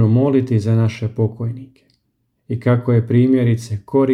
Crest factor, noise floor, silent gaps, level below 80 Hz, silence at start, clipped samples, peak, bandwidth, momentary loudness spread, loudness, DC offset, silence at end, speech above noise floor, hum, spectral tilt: 14 dB; -68 dBFS; none; -56 dBFS; 0 s; under 0.1%; -4 dBFS; 9.2 kHz; 12 LU; -17 LUFS; under 0.1%; 0 s; 51 dB; none; -9 dB/octave